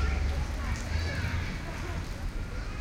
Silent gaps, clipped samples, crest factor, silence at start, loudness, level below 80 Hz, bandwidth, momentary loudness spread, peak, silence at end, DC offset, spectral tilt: none; under 0.1%; 14 dB; 0 s; -34 LUFS; -34 dBFS; 14.5 kHz; 6 LU; -18 dBFS; 0 s; under 0.1%; -5.5 dB/octave